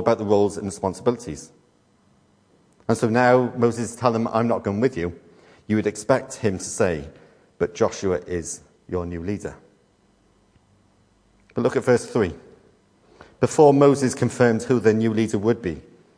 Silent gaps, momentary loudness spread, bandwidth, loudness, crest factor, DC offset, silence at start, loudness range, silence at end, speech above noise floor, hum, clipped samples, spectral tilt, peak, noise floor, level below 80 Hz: none; 14 LU; 10.5 kHz; -22 LUFS; 20 dB; under 0.1%; 0 s; 8 LU; 0.35 s; 40 dB; none; under 0.1%; -6 dB/octave; -2 dBFS; -60 dBFS; -52 dBFS